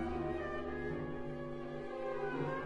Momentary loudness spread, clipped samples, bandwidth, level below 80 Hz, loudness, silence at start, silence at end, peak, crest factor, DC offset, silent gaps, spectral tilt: 5 LU; under 0.1%; 10.5 kHz; -56 dBFS; -41 LUFS; 0 s; 0 s; -26 dBFS; 14 dB; under 0.1%; none; -8 dB/octave